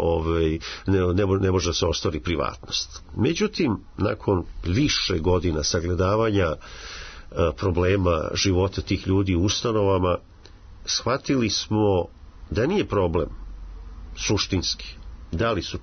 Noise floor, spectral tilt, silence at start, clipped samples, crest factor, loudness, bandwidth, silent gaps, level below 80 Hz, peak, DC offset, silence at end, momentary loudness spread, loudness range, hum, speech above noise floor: -45 dBFS; -5 dB/octave; 0 s; under 0.1%; 14 dB; -24 LUFS; 6.6 kHz; none; -40 dBFS; -10 dBFS; under 0.1%; 0 s; 13 LU; 2 LU; none; 22 dB